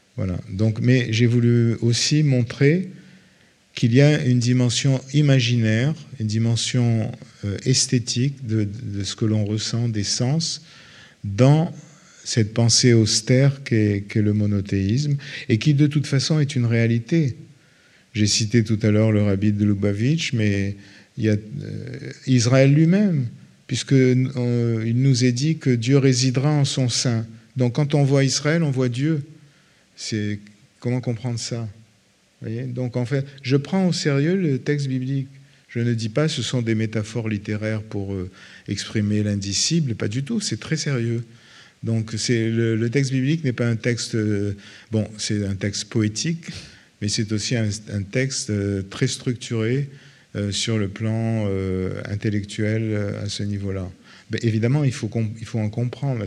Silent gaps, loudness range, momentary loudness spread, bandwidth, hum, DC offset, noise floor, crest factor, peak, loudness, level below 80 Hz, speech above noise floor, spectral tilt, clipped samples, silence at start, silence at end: none; 6 LU; 12 LU; 11 kHz; none; under 0.1%; -59 dBFS; 20 dB; 0 dBFS; -21 LUFS; -62 dBFS; 39 dB; -5.5 dB/octave; under 0.1%; 0.15 s; 0 s